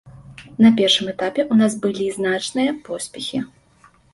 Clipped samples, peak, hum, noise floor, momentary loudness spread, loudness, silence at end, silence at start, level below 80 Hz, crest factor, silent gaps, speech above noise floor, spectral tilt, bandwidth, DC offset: under 0.1%; -2 dBFS; none; -53 dBFS; 14 LU; -19 LUFS; 0.65 s; 0.05 s; -58 dBFS; 18 dB; none; 35 dB; -4.5 dB/octave; 11.5 kHz; under 0.1%